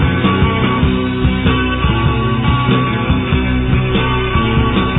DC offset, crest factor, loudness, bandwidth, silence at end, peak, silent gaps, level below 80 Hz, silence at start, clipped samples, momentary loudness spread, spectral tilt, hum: under 0.1%; 12 dB; -14 LUFS; 4 kHz; 0 s; -2 dBFS; none; -22 dBFS; 0 s; under 0.1%; 2 LU; -10.5 dB/octave; none